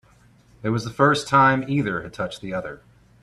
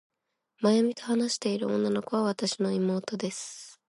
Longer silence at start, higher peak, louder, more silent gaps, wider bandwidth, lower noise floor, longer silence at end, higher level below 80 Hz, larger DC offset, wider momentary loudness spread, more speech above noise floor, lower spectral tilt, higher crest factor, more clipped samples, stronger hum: about the same, 0.65 s vs 0.6 s; first, -4 dBFS vs -12 dBFS; first, -22 LUFS vs -28 LUFS; neither; first, 13 kHz vs 11.5 kHz; second, -55 dBFS vs -74 dBFS; first, 0.45 s vs 0.15 s; first, -54 dBFS vs -76 dBFS; neither; first, 14 LU vs 9 LU; second, 33 dB vs 47 dB; about the same, -6 dB/octave vs -5 dB/octave; about the same, 20 dB vs 16 dB; neither; neither